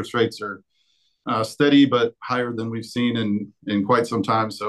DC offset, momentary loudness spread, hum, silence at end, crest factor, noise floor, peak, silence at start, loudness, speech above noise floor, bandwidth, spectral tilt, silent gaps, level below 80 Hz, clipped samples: under 0.1%; 13 LU; none; 0 s; 16 dB; -67 dBFS; -6 dBFS; 0 s; -21 LUFS; 45 dB; 12.5 kHz; -6 dB/octave; none; -68 dBFS; under 0.1%